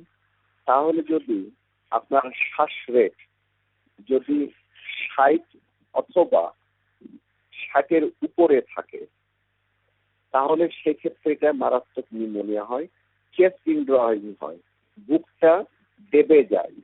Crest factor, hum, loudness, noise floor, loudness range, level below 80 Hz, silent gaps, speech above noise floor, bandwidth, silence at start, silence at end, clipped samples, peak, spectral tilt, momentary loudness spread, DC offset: 18 dB; 50 Hz at -75 dBFS; -22 LUFS; -71 dBFS; 2 LU; -72 dBFS; none; 50 dB; 4.1 kHz; 0.65 s; 0.15 s; under 0.1%; -4 dBFS; -3.5 dB/octave; 16 LU; under 0.1%